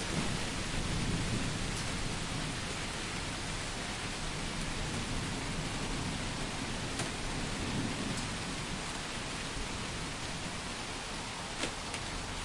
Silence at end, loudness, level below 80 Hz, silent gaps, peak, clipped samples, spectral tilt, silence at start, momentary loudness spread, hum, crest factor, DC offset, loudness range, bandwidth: 0 s; -37 LUFS; -44 dBFS; none; -20 dBFS; under 0.1%; -3.5 dB/octave; 0 s; 3 LU; none; 16 dB; under 0.1%; 2 LU; 11.5 kHz